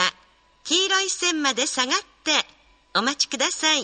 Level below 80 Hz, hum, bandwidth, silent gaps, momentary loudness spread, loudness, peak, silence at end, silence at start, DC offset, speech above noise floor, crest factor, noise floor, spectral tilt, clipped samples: -66 dBFS; none; 9.4 kHz; none; 5 LU; -22 LUFS; -4 dBFS; 0 s; 0 s; under 0.1%; 34 dB; 20 dB; -57 dBFS; 0 dB/octave; under 0.1%